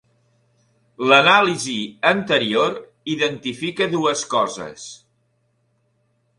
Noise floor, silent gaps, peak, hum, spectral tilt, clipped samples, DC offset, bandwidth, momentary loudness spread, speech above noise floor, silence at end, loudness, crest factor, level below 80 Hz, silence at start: -66 dBFS; none; 0 dBFS; none; -3.5 dB/octave; under 0.1%; under 0.1%; 11.5 kHz; 18 LU; 47 dB; 1.45 s; -18 LUFS; 22 dB; -64 dBFS; 1 s